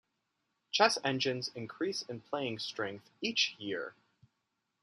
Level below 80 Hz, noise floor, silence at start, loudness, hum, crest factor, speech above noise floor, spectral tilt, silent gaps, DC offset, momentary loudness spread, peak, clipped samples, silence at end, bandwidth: -82 dBFS; -83 dBFS; 0.75 s; -34 LUFS; none; 24 dB; 49 dB; -3 dB/octave; none; under 0.1%; 12 LU; -12 dBFS; under 0.1%; 0.9 s; 13 kHz